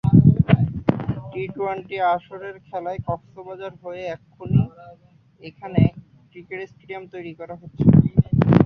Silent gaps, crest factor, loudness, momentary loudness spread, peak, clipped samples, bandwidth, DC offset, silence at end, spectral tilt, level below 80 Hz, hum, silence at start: none; 20 dB; -21 LUFS; 20 LU; -2 dBFS; under 0.1%; 5.2 kHz; under 0.1%; 0 s; -11 dB/octave; -40 dBFS; none; 0.05 s